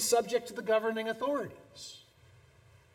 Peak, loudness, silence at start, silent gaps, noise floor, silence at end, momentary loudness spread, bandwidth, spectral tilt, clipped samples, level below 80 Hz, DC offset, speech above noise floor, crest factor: -14 dBFS; -32 LUFS; 0 s; none; -61 dBFS; 0.95 s; 18 LU; 17 kHz; -2.5 dB/octave; under 0.1%; -72 dBFS; under 0.1%; 29 dB; 18 dB